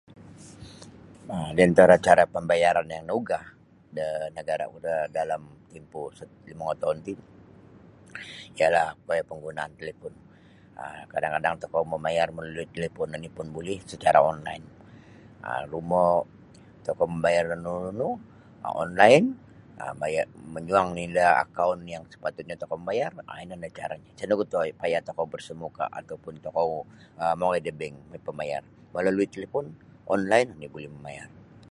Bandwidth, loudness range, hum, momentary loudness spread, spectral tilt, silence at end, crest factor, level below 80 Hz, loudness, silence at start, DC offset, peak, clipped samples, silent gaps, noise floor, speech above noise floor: 11.5 kHz; 9 LU; none; 20 LU; -5.5 dB/octave; 0.45 s; 26 dB; -58 dBFS; -26 LUFS; 0.2 s; under 0.1%; -2 dBFS; under 0.1%; none; -53 dBFS; 27 dB